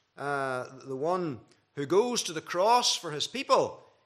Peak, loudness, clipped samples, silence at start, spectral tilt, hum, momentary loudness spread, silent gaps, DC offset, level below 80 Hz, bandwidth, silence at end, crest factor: -8 dBFS; -28 LUFS; under 0.1%; 0.2 s; -3 dB/octave; none; 14 LU; none; under 0.1%; -80 dBFS; 14.5 kHz; 0.3 s; 20 dB